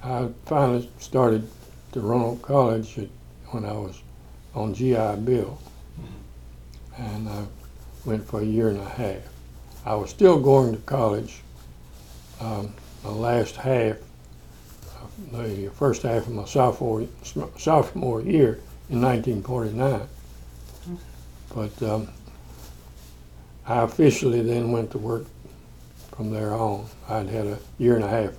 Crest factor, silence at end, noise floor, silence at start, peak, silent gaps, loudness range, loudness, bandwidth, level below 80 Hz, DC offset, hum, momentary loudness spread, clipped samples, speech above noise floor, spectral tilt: 22 dB; 0 s; -45 dBFS; 0 s; -4 dBFS; none; 7 LU; -24 LUFS; 18.5 kHz; -44 dBFS; under 0.1%; 60 Hz at -45 dBFS; 24 LU; under 0.1%; 22 dB; -7.5 dB/octave